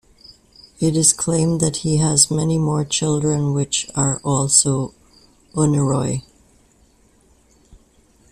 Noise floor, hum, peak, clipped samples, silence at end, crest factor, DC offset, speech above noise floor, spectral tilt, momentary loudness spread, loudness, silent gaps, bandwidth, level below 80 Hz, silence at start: -55 dBFS; none; 0 dBFS; under 0.1%; 2.1 s; 20 dB; under 0.1%; 37 dB; -4.5 dB/octave; 8 LU; -18 LUFS; none; 14 kHz; -48 dBFS; 0.3 s